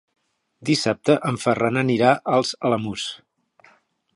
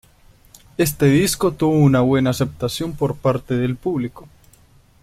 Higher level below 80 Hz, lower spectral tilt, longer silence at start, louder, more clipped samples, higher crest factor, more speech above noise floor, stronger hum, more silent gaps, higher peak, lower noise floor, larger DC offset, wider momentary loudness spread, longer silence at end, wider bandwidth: second, -62 dBFS vs -46 dBFS; about the same, -5 dB/octave vs -6 dB/octave; second, 0.6 s vs 0.8 s; about the same, -21 LUFS vs -19 LUFS; neither; about the same, 20 dB vs 18 dB; first, 38 dB vs 34 dB; neither; neither; about the same, -2 dBFS vs -2 dBFS; first, -58 dBFS vs -52 dBFS; neither; first, 12 LU vs 9 LU; first, 1 s vs 0.8 s; second, 11.5 kHz vs 16 kHz